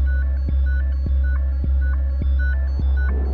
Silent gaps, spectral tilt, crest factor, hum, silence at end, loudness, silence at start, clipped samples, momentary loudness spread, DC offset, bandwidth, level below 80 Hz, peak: none; -10 dB/octave; 6 dB; none; 0 s; -22 LUFS; 0 s; under 0.1%; 1 LU; under 0.1%; 4.5 kHz; -18 dBFS; -12 dBFS